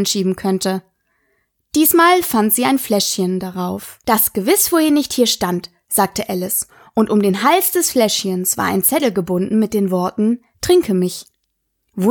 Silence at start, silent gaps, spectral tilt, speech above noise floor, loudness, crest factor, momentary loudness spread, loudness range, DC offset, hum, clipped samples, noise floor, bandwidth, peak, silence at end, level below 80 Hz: 0 s; none; -4 dB/octave; 55 dB; -16 LUFS; 16 dB; 9 LU; 2 LU; under 0.1%; none; under 0.1%; -71 dBFS; 19.5 kHz; 0 dBFS; 0 s; -52 dBFS